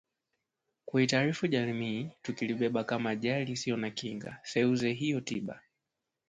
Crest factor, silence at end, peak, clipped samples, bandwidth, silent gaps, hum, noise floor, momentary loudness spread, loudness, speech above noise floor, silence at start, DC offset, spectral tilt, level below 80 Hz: 20 dB; 0.7 s; -14 dBFS; under 0.1%; 9.4 kHz; none; none; -87 dBFS; 11 LU; -32 LUFS; 55 dB; 0.85 s; under 0.1%; -5.5 dB/octave; -70 dBFS